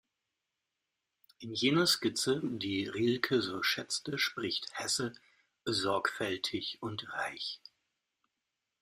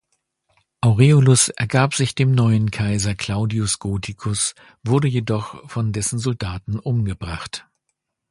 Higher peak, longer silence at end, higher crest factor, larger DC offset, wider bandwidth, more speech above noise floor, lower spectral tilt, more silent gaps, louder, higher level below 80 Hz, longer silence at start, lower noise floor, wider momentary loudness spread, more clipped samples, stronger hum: second, -12 dBFS vs 0 dBFS; first, 1.25 s vs 0.7 s; first, 24 dB vs 18 dB; neither; first, 15.5 kHz vs 11.5 kHz; second, 53 dB vs 57 dB; second, -3.5 dB/octave vs -5 dB/octave; neither; second, -33 LUFS vs -20 LUFS; second, -72 dBFS vs -42 dBFS; first, 1.4 s vs 0.85 s; first, -87 dBFS vs -76 dBFS; about the same, 12 LU vs 13 LU; neither; neither